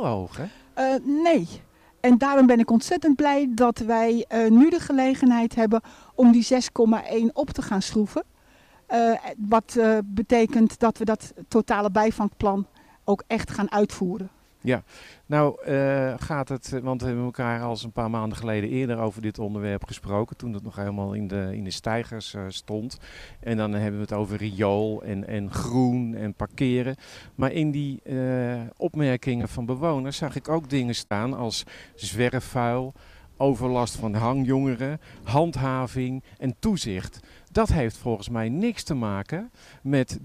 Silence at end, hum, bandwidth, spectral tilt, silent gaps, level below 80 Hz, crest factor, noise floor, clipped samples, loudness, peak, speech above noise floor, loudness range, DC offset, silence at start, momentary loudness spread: 0 s; none; 13.5 kHz; -6.5 dB/octave; none; -48 dBFS; 16 dB; -56 dBFS; under 0.1%; -24 LUFS; -8 dBFS; 32 dB; 9 LU; under 0.1%; 0 s; 12 LU